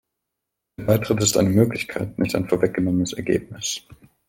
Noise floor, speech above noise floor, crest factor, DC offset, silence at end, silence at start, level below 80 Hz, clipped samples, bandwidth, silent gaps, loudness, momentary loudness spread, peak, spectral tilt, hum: -82 dBFS; 61 dB; 20 dB; under 0.1%; 0.35 s; 0.8 s; -50 dBFS; under 0.1%; 17 kHz; none; -22 LUFS; 10 LU; -2 dBFS; -5 dB/octave; none